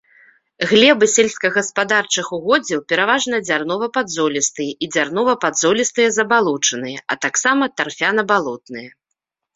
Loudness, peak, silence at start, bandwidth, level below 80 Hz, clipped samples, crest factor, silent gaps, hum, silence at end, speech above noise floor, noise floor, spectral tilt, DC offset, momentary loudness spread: -17 LUFS; 0 dBFS; 0.6 s; 8 kHz; -62 dBFS; under 0.1%; 18 dB; none; none; 0.65 s; 61 dB; -78 dBFS; -2 dB/octave; under 0.1%; 8 LU